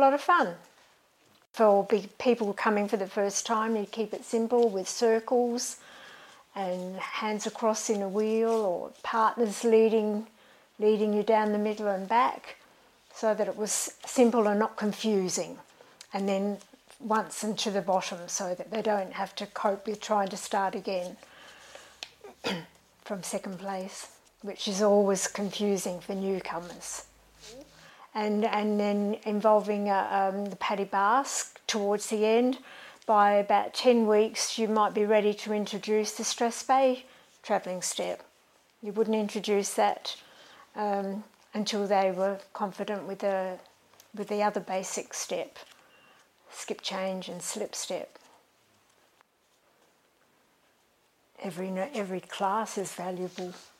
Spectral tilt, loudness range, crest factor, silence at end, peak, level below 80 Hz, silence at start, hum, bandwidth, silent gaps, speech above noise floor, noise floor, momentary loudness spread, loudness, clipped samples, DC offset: -4 dB/octave; 10 LU; 20 dB; 0.15 s; -10 dBFS; -76 dBFS; 0 s; none; 16 kHz; none; 40 dB; -68 dBFS; 16 LU; -29 LUFS; under 0.1%; under 0.1%